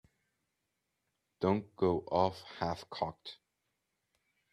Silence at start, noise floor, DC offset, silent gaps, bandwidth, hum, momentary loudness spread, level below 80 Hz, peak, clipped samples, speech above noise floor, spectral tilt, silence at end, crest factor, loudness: 1.4 s; -85 dBFS; under 0.1%; none; 12.5 kHz; none; 8 LU; -68 dBFS; -14 dBFS; under 0.1%; 50 dB; -7 dB/octave; 1.2 s; 24 dB; -35 LUFS